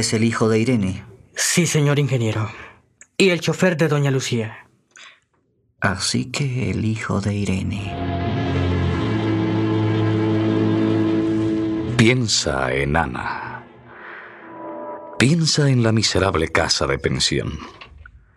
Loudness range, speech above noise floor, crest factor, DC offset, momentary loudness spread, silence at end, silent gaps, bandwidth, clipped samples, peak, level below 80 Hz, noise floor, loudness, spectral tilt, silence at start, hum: 4 LU; 45 dB; 20 dB; under 0.1%; 16 LU; 0.35 s; none; 14.5 kHz; under 0.1%; 0 dBFS; -44 dBFS; -65 dBFS; -20 LUFS; -5 dB/octave; 0 s; none